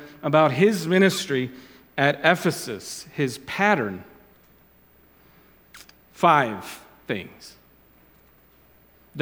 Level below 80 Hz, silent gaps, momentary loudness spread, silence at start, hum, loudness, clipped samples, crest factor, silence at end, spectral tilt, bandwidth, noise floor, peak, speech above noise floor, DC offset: -64 dBFS; none; 16 LU; 0 s; none; -22 LUFS; under 0.1%; 24 dB; 0 s; -5 dB/octave; 19 kHz; -56 dBFS; -2 dBFS; 34 dB; under 0.1%